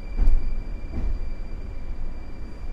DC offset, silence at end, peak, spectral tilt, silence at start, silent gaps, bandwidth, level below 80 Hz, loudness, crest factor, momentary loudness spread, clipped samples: under 0.1%; 0 s; -6 dBFS; -8 dB/octave; 0 s; none; 5 kHz; -24 dBFS; -33 LUFS; 16 dB; 12 LU; under 0.1%